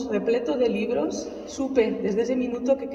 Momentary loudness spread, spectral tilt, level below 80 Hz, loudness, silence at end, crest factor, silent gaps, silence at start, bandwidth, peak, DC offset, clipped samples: 7 LU; -5.5 dB/octave; -56 dBFS; -25 LUFS; 0 s; 16 dB; none; 0 s; 8.2 kHz; -8 dBFS; under 0.1%; under 0.1%